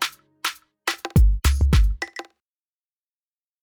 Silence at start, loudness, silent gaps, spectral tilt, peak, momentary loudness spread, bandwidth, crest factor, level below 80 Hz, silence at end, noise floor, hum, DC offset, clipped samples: 0 s; -23 LUFS; none; -4.5 dB/octave; -8 dBFS; 12 LU; over 20 kHz; 14 dB; -24 dBFS; 1.4 s; under -90 dBFS; none; under 0.1%; under 0.1%